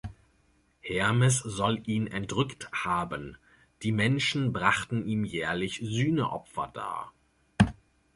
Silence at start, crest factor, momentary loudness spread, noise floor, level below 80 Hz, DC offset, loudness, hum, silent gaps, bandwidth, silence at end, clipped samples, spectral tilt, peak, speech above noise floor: 0.05 s; 22 dB; 11 LU; -67 dBFS; -52 dBFS; under 0.1%; -29 LUFS; none; none; 11.5 kHz; 0.4 s; under 0.1%; -5 dB/octave; -6 dBFS; 38 dB